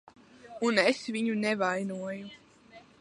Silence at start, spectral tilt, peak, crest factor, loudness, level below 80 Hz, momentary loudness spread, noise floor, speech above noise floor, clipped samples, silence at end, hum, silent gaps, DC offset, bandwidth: 0.45 s; -4.5 dB/octave; -8 dBFS; 22 dB; -29 LUFS; -76 dBFS; 17 LU; -55 dBFS; 26 dB; under 0.1%; 0.2 s; none; none; under 0.1%; 11.5 kHz